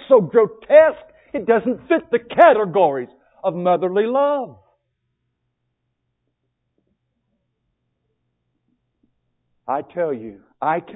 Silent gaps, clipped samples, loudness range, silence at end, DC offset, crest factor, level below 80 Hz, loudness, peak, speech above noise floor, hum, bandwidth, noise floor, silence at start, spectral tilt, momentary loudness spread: none; under 0.1%; 14 LU; 0.05 s; under 0.1%; 20 dB; -64 dBFS; -18 LUFS; 0 dBFS; 57 dB; none; 4 kHz; -74 dBFS; 0.1 s; -9 dB/octave; 18 LU